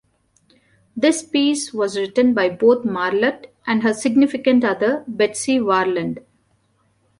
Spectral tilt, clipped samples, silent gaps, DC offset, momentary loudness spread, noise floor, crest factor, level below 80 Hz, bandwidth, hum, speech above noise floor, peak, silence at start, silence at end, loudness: -4 dB/octave; under 0.1%; none; under 0.1%; 6 LU; -63 dBFS; 16 dB; -62 dBFS; 11.5 kHz; none; 45 dB; -4 dBFS; 0.95 s; 1 s; -18 LUFS